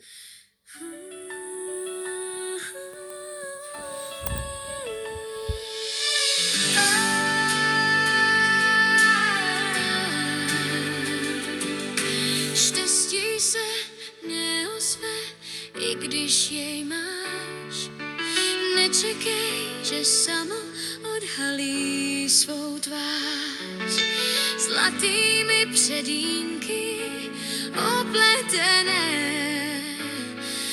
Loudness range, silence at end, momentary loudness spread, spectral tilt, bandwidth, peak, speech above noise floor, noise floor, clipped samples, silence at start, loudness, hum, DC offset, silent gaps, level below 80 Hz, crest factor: 13 LU; 0 s; 15 LU; -1 dB/octave; over 20 kHz; -4 dBFS; 27 dB; -49 dBFS; under 0.1%; 0.05 s; -23 LUFS; none; under 0.1%; none; -52 dBFS; 20 dB